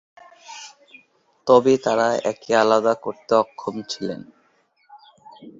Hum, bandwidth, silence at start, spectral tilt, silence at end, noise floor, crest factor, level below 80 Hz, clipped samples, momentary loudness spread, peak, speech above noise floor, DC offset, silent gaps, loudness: none; 7.8 kHz; 0.5 s; -4.5 dB/octave; 0.1 s; -63 dBFS; 20 dB; -64 dBFS; under 0.1%; 22 LU; -2 dBFS; 43 dB; under 0.1%; none; -20 LUFS